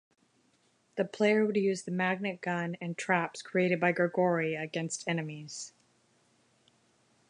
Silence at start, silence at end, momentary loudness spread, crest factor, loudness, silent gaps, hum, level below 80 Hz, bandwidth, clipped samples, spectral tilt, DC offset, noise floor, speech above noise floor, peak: 0.95 s; 1.6 s; 13 LU; 20 dB; -31 LUFS; none; none; -80 dBFS; 11 kHz; under 0.1%; -5.5 dB/octave; under 0.1%; -70 dBFS; 40 dB; -12 dBFS